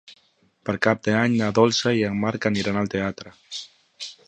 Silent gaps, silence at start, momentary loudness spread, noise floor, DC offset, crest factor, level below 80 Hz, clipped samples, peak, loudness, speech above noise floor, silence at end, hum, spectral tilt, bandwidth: none; 0.1 s; 16 LU; -62 dBFS; under 0.1%; 20 dB; -56 dBFS; under 0.1%; -4 dBFS; -22 LUFS; 40 dB; 0.15 s; none; -5 dB/octave; 9.2 kHz